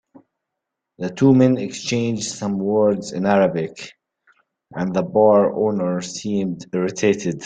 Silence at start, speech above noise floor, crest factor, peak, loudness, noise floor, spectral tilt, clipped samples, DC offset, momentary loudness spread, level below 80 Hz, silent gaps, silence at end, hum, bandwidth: 1 s; 62 dB; 16 dB; -2 dBFS; -19 LUFS; -81 dBFS; -6 dB/octave; under 0.1%; under 0.1%; 13 LU; -60 dBFS; none; 0 s; none; 9.4 kHz